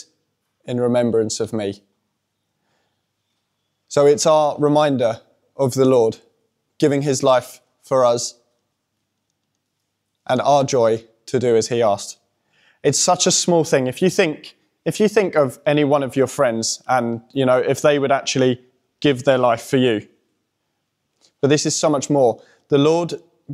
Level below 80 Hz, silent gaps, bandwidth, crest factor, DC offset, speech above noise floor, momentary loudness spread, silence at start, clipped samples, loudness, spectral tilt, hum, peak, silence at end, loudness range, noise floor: -66 dBFS; none; 15 kHz; 18 dB; under 0.1%; 57 dB; 10 LU; 0.65 s; under 0.1%; -18 LUFS; -4.5 dB/octave; none; -2 dBFS; 0 s; 4 LU; -74 dBFS